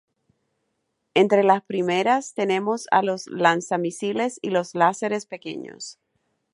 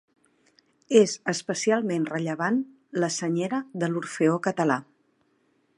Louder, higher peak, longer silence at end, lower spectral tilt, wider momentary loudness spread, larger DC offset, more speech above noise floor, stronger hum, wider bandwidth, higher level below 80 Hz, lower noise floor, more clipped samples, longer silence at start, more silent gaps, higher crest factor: first, -22 LUFS vs -26 LUFS; about the same, -2 dBFS vs -4 dBFS; second, 0.6 s vs 0.95 s; about the same, -4.5 dB/octave vs -5 dB/octave; first, 15 LU vs 8 LU; neither; first, 53 dB vs 43 dB; neither; about the same, 11.5 kHz vs 11 kHz; about the same, -76 dBFS vs -78 dBFS; first, -75 dBFS vs -68 dBFS; neither; first, 1.15 s vs 0.9 s; neither; about the same, 20 dB vs 22 dB